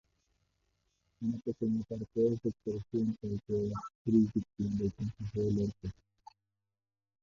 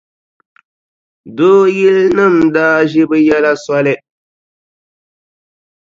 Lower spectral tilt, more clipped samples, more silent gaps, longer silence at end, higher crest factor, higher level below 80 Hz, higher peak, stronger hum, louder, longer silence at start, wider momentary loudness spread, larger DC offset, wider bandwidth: first, -9.5 dB/octave vs -6.5 dB/octave; neither; first, 3.95-4.05 s vs none; second, 1.3 s vs 1.95 s; first, 20 dB vs 12 dB; about the same, -58 dBFS vs -54 dBFS; second, -16 dBFS vs 0 dBFS; neither; second, -34 LUFS vs -10 LUFS; about the same, 1.2 s vs 1.25 s; first, 10 LU vs 6 LU; neither; about the same, 7.2 kHz vs 7.6 kHz